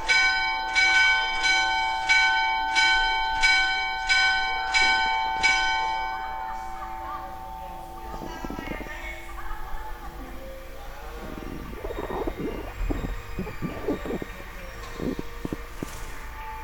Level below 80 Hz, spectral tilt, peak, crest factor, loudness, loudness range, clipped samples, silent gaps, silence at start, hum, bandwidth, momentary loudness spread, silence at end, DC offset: -38 dBFS; -2 dB/octave; -8 dBFS; 20 dB; -23 LUFS; 17 LU; under 0.1%; none; 0 s; none; 17.5 kHz; 20 LU; 0 s; under 0.1%